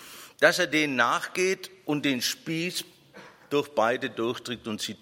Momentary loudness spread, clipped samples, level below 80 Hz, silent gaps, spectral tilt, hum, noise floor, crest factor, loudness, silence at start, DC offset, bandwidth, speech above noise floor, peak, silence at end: 11 LU; under 0.1%; -72 dBFS; none; -3.5 dB/octave; none; -51 dBFS; 24 dB; -27 LUFS; 0 s; under 0.1%; 16.5 kHz; 24 dB; -4 dBFS; 0.05 s